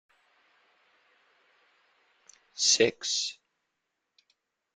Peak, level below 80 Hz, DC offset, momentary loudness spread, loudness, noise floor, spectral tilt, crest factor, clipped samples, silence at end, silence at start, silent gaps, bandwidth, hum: -8 dBFS; -80 dBFS; under 0.1%; 13 LU; -26 LUFS; -83 dBFS; -0.5 dB/octave; 26 dB; under 0.1%; 1.45 s; 2.55 s; none; 10.5 kHz; none